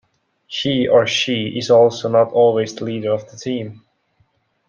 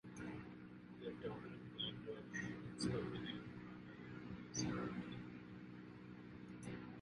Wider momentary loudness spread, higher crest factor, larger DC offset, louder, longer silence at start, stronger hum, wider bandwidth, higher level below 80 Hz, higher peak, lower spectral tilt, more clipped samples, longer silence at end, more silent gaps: about the same, 12 LU vs 12 LU; about the same, 16 dB vs 20 dB; neither; first, -17 LUFS vs -49 LUFS; first, 0.5 s vs 0.05 s; neither; second, 7.4 kHz vs 11 kHz; first, -60 dBFS vs -70 dBFS; first, -2 dBFS vs -30 dBFS; about the same, -5 dB/octave vs -4.5 dB/octave; neither; first, 0.9 s vs 0 s; neither